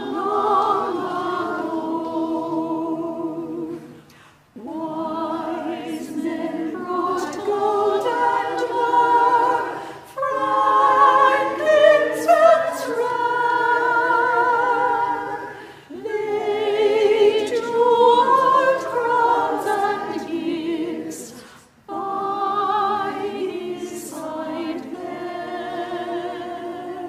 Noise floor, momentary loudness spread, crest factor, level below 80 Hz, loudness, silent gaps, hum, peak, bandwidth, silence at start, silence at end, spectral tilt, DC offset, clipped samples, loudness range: -50 dBFS; 15 LU; 18 dB; -64 dBFS; -20 LUFS; none; none; -2 dBFS; 15.5 kHz; 0 s; 0 s; -4 dB/octave; under 0.1%; under 0.1%; 12 LU